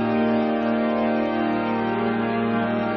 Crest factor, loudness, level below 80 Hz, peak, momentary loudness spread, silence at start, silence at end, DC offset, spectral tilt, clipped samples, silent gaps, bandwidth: 12 dB; -23 LUFS; -56 dBFS; -10 dBFS; 2 LU; 0 s; 0 s; under 0.1%; -5 dB/octave; under 0.1%; none; 5.8 kHz